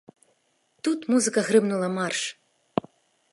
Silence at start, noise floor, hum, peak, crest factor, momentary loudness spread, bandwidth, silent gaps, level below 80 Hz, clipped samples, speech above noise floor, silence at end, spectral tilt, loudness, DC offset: 0.85 s; -69 dBFS; none; -6 dBFS; 22 dB; 11 LU; 11.5 kHz; none; -70 dBFS; under 0.1%; 45 dB; 0.55 s; -4 dB/octave; -25 LUFS; under 0.1%